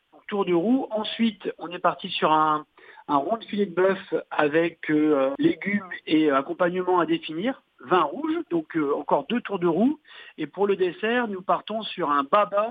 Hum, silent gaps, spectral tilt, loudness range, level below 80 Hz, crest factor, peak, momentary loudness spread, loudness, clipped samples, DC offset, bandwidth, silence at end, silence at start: none; none; -8.5 dB/octave; 2 LU; -72 dBFS; 20 dB; -6 dBFS; 8 LU; -24 LUFS; under 0.1%; under 0.1%; 4.9 kHz; 0 s; 0.3 s